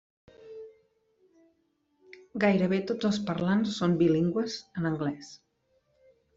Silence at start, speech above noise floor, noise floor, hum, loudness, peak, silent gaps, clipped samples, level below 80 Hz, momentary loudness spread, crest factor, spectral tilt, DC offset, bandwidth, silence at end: 0.4 s; 46 dB; -73 dBFS; none; -28 LUFS; -12 dBFS; none; under 0.1%; -64 dBFS; 22 LU; 18 dB; -6.5 dB/octave; under 0.1%; 7.8 kHz; 1 s